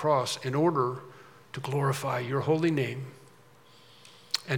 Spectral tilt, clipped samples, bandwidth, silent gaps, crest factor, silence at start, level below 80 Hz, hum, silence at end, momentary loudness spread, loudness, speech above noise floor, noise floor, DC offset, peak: -5.5 dB/octave; under 0.1%; 18 kHz; none; 20 dB; 0 s; -78 dBFS; none; 0 s; 16 LU; -29 LUFS; 29 dB; -57 dBFS; under 0.1%; -10 dBFS